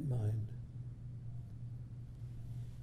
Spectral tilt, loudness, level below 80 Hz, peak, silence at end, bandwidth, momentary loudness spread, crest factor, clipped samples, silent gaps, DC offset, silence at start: -9.5 dB/octave; -45 LUFS; -56 dBFS; -28 dBFS; 0 s; 9.6 kHz; 11 LU; 14 dB; under 0.1%; none; under 0.1%; 0 s